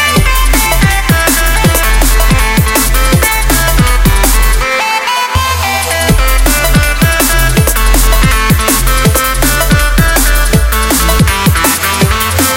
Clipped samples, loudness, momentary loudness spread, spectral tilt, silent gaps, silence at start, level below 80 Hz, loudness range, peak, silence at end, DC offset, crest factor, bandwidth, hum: 0.1%; -9 LUFS; 2 LU; -3.5 dB/octave; none; 0 s; -12 dBFS; 1 LU; 0 dBFS; 0 s; under 0.1%; 8 dB; 17 kHz; none